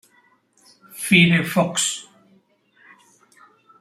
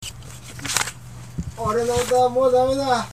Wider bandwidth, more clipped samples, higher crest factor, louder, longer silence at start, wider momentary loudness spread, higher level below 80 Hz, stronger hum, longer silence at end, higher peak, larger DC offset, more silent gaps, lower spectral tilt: about the same, 15.5 kHz vs 15.5 kHz; neither; about the same, 22 dB vs 20 dB; about the same, -18 LUFS vs -20 LUFS; first, 0.95 s vs 0 s; about the same, 18 LU vs 18 LU; second, -60 dBFS vs -42 dBFS; neither; first, 1.8 s vs 0 s; about the same, -2 dBFS vs -2 dBFS; second, under 0.1% vs 0.4%; neither; about the same, -4 dB/octave vs -3.5 dB/octave